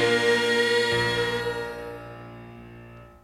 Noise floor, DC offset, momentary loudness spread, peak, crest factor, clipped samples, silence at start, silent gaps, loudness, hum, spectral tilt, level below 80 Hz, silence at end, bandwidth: -46 dBFS; under 0.1%; 23 LU; -10 dBFS; 16 dB; under 0.1%; 0 s; none; -23 LUFS; none; -3.5 dB/octave; -52 dBFS; 0.15 s; 15.5 kHz